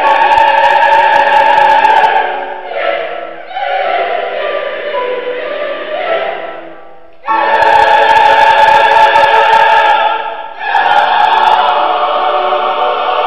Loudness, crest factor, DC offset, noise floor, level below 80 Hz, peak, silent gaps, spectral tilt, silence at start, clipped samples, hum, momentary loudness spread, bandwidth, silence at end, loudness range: -9 LUFS; 10 dB; 3%; -36 dBFS; -48 dBFS; 0 dBFS; none; -2.5 dB/octave; 0 s; 0.2%; none; 12 LU; 10 kHz; 0 s; 9 LU